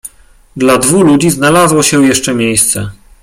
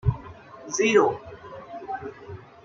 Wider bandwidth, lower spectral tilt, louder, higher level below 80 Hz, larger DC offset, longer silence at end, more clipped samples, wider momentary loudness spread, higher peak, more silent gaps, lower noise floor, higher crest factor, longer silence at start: first, 16.5 kHz vs 7.6 kHz; about the same, -4 dB/octave vs -5 dB/octave; first, -9 LUFS vs -24 LUFS; about the same, -40 dBFS vs -44 dBFS; neither; about the same, 0.3 s vs 0.25 s; neither; second, 5 LU vs 23 LU; first, 0 dBFS vs -6 dBFS; neither; second, -40 dBFS vs -44 dBFS; second, 10 dB vs 20 dB; about the same, 0.05 s vs 0.05 s